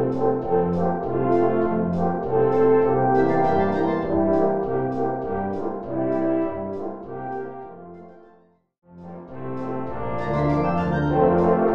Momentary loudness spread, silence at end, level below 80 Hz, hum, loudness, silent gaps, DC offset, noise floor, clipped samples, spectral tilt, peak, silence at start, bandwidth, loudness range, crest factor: 14 LU; 0 s; -46 dBFS; none; -22 LUFS; 8.78-8.82 s; 1%; -57 dBFS; under 0.1%; -10 dB/octave; -6 dBFS; 0 s; 6.6 kHz; 13 LU; 16 dB